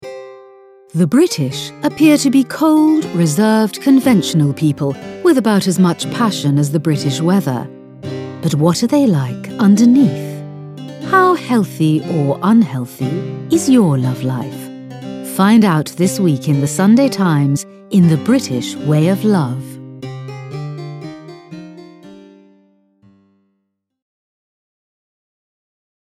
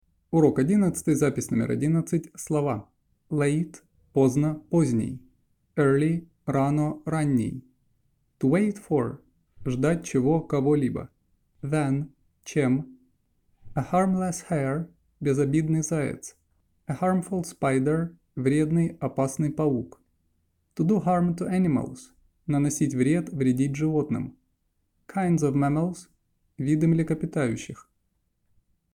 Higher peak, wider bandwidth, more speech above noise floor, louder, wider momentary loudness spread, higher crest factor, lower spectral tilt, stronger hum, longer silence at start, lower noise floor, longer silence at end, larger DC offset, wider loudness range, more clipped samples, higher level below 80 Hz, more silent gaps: first, 0 dBFS vs -8 dBFS; about the same, 15 kHz vs 15.5 kHz; first, 57 dB vs 49 dB; first, -14 LUFS vs -26 LUFS; first, 18 LU vs 13 LU; about the same, 14 dB vs 18 dB; second, -6 dB/octave vs -7.5 dB/octave; neither; second, 0 s vs 0.3 s; about the same, -70 dBFS vs -73 dBFS; first, 3.85 s vs 1.2 s; neither; first, 7 LU vs 2 LU; neither; about the same, -60 dBFS vs -56 dBFS; neither